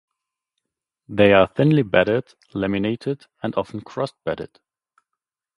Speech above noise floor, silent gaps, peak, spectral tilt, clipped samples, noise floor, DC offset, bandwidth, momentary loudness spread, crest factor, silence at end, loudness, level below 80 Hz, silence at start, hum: 64 dB; none; 0 dBFS; -8 dB/octave; under 0.1%; -84 dBFS; under 0.1%; 11 kHz; 15 LU; 22 dB; 1.1 s; -21 LUFS; -52 dBFS; 1.1 s; none